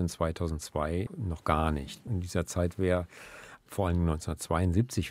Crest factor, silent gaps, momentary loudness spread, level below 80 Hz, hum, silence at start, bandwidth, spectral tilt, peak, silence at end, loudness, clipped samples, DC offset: 22 dB; none; 9 LU; -42 dBFS; none; 0 s; 15.5 kHz; -6.5 dB/octave; -8 dBFS; 0 s; -31 LUFS; under 0.1%; under 0.1%